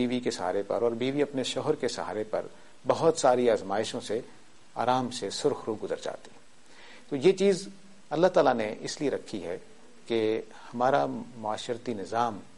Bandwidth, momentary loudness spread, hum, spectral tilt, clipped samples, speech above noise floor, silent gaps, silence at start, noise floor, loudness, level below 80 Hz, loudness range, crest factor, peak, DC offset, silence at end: 11.5 kHz; 13 LU; none; -4.5 dB/octave; under 0.1%; 26 dB; none; 0 s; -55 dBFS; -29 LUFS; -66 dBFS; 3 LU; 18 dB; -10 dBFS; 0.4%; 0.15 s